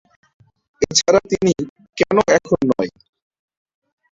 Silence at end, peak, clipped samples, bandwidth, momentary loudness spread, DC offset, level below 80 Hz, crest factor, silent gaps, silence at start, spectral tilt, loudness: 1.25 s; 0 dBFS; under 0.1%; 7.8 kHz; 10 LU; under 0.1%; -50 dBFS; 20 dB; 1.69-1.76 s; 0.8 s; -4 dB/octave; -17 LUFS